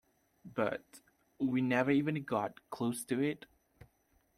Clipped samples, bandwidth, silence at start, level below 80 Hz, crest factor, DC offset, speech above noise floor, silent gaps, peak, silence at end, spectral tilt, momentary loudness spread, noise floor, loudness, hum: under 0.1%; 15 kHz; 0.45 s; -74 dBFS; 20 dB; under 0.1%; 39 dB; none; -16 dBFS; 1 s; -6 dB/octave; 12 LU; -73 dBFS; -35 LUFS; none